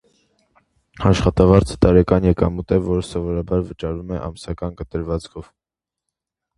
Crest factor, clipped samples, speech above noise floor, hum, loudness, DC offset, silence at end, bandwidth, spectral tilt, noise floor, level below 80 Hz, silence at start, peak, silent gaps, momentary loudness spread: 20 dB; under 0.1%; 69 dB; none; -19 LUFS; under 0.1%; 1.15 s; 11.5 kHz; -7.5 dB/octave; -87 dBFS; -32 dBFS; 1 s; 0 dBFS; none; 14 LU